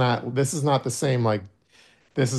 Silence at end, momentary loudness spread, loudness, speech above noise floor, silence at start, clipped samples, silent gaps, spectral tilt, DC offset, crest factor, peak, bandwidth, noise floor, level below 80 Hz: 0 s; 6 LU; -24 LUFS; 34 dB; 0 s; under 0.1%; none; -5.5 dB/octave; under 0.1%; 16 dB; -8 dBFS; 12.5 kHz; -57 dBFS; -64 dBFS